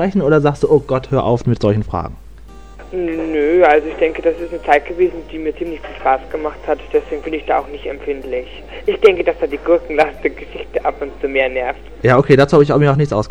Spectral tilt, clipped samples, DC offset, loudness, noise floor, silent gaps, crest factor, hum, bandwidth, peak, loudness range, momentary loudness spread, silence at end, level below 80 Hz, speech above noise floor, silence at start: -7.5 dB/octave; under 0.1%; 1%; -16 LUFS; -37 dBFS; none; 16 dB; none; 9.4 kHz; 0 dBFS; 5 LU; 13 LU; 0 s; -36 dBFS; 21 dB; 0 s